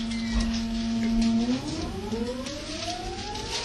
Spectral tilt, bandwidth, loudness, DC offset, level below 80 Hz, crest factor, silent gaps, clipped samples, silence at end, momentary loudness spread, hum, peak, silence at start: -4.5 dB/octave; 12 kHz; -29 LUFS; under 0.1%; -38 dBFS; 14 dB; none; under 0.1%; 0 s; 9 LU; none; -14 dBFS; 0 s